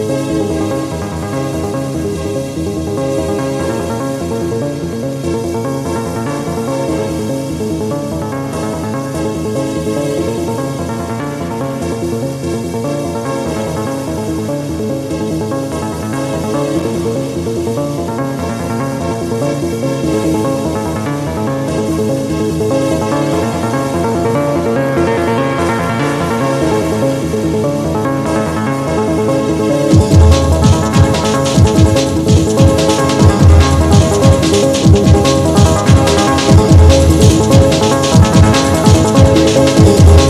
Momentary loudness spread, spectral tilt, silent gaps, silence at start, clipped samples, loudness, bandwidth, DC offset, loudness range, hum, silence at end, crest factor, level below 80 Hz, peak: 10 LU; -6 dB/octave; none; 0 s; 0.4%; -13 LUFS; 14.5 kHz; under 0.1%; 9 LU; none; 0 s; 12 dB; -24 dBFS; 0 dBFS